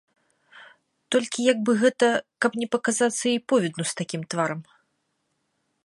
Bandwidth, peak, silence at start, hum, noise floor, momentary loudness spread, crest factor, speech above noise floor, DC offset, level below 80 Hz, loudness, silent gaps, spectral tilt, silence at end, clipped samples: 11.5 kHz; -6 dBFS; 0.55 s; none; -74 dBFS; 8 LU; 20 dB; 51 dB; under 0.1%; -76 dBFS; -24 LUFS; none; -4 dB/octave; 1.25 s; under 0.1%